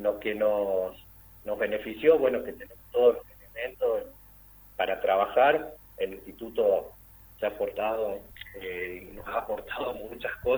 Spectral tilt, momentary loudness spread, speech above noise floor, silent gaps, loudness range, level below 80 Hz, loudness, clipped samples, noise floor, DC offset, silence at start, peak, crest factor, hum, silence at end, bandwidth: -5.5 dB/octave; 17 LU; 25 dB; none; 6 LU; -56 dBFS; -28 LUFS; under 0.1%; -53 dBFS; under 0.1%; 0 s; -10 dBFS; 20 dB; 50 Hz at -55 dBFS; 0 s; over 20 kHz